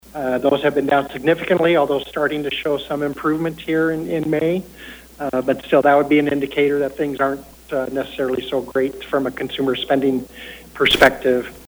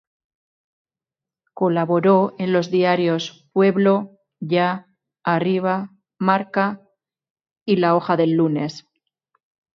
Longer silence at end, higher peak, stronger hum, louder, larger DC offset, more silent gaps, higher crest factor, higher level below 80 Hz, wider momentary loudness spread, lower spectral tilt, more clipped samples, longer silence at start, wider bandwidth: second, 0.05 s vs 0.95 s; about the same, 0 dBFS vs -2 dBFS; neither; about the same, -19 LUFS vs -20 LUFS; neither; second, none vs 7.30-7.35 s, 7.62-7.66 s; about the same, 20 dB vs 18 dB; first, -48 dBFS vs -70 dBFS; about the same, 11 LU vs 13 LU; second, -5.5 dB/octave vs -7.5 dB/octave; neither; second, 0.15 s vs 1.55 s; first, over 20 kHz vs 7 kHz